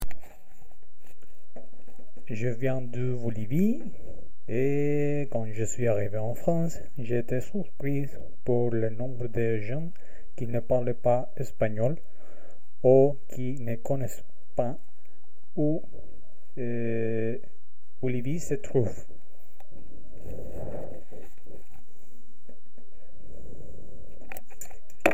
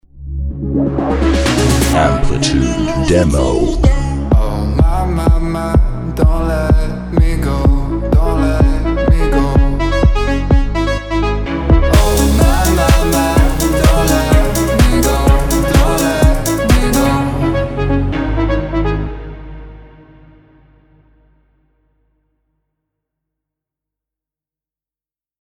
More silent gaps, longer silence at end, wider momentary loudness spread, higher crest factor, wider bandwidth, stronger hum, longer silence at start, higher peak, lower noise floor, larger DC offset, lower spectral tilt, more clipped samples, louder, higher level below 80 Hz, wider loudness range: neither; second, 0 s vs 5.55 s; first, 21 LU vs 6 LU; first, 24 dB vs 12 dB; second, 16 kHz vs over 20 kHz; neither; second, 0 s vs 0.15 s; second, -4 dBFS vs 0 dBFS; second, -68 dBFS vs under -90 dBFS; first, 7% vs under 0.1%; first, -7.5 dB/octave vs -6 dB/octave; neither; second, -30 LUFS vs -14 LUFS; second, -52 dBFS vs -16 dBFS; first, 18 LU vs 6 LU